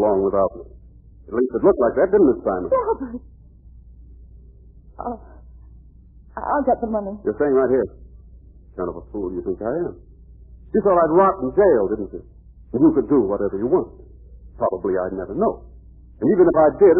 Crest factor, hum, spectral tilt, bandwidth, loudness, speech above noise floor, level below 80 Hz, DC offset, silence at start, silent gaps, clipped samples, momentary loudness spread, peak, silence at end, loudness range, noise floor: 16 dB; none; -13.5 dB/octave; 2.8 kHz; -20 LUFS; 27 dB; -44 dBFS; under 0.1%; 0 s; none; under 0.1%; 16 LU; -4 dBFS; 0 s; 9 LU; -46 dBFS